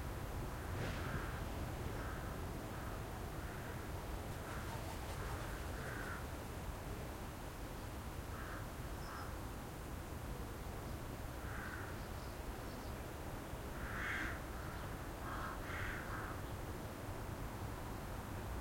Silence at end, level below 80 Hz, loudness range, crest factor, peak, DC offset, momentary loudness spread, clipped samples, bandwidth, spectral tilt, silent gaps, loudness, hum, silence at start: 0 s; -50 dBFS; 3 LU; 16 dB; -30 dBFS; under 0.1%; 4 LU; under 0.1%; 16.5 kHz; -5 dB/octave; none; -46 LUFS; none; 0 s